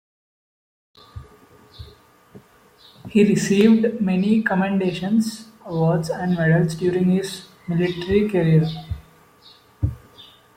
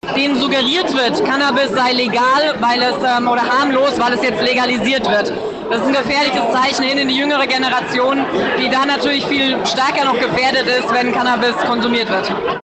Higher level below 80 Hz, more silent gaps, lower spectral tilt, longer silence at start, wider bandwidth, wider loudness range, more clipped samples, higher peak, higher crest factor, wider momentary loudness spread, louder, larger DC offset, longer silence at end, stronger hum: first, -46 dBFS vs -52 dBFS; neither; first, -7 dB/octave vs -3.5 dB/octave; first, 1.15 s vs 0.05 s; first, 15.5 kHz vs 9 kHz; first, 4 LU vs 1 LU; neither; first, -2 dBFS vs -6 dBFS; first, 18 dB vs 10 dB; first, 14 LU vs 2 LU; second, -20 LUFS vs -15 LUFS; neither; first, 0.35 s vs 0.05 s; neither